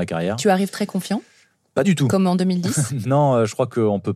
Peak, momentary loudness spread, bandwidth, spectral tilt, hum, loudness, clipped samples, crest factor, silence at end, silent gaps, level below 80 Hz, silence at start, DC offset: -4 dBFS; 7 LU; 14.5 kHz; -6 dB/octave; none; -20 LUFS; under 0.1%; 16 dB; 0 s; none; -64 dBFS; 0 s; under 0.1%